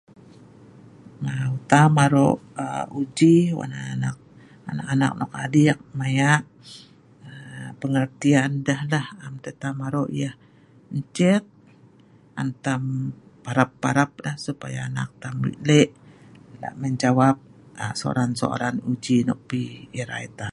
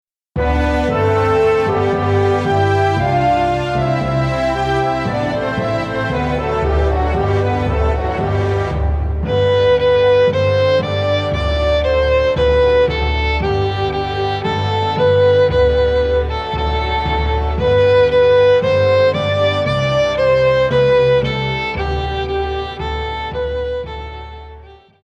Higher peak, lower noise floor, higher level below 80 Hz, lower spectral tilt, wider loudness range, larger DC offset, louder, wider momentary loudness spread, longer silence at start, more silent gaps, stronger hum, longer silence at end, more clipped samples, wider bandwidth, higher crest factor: about the same, -2 dBFS vs -4 dBFS; first, -53 dBFS vs -39 dBFS; second, -60 dBFS vs -26 dBFS; about the same, -6 dB/octave vs -7 dB/octave; about the same, 6 LU vs 4 LU; neither; second, -23 LUFS vs -16 LUFS; first, 15 LU vs 8 LU; first, 1.05 s vs 0.35 s; neither; neither; second, 0 s vs 0.3 s; neither; first, 11.5 kHz vs 8.4 kHz; first, 22 dB vs 12 dB